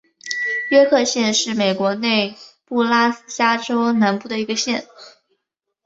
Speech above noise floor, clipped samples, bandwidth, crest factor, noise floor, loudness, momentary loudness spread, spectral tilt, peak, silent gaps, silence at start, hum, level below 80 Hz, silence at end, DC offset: 60 dB; under 0.1%; 8 kHz; 18 dB; -78 dBFS; -18 LUFS; 8 LU; -3 dB/octave; -2 dBFS; none; 0.25 s; none; -66 dBFS; 0.75 s; under 0.1%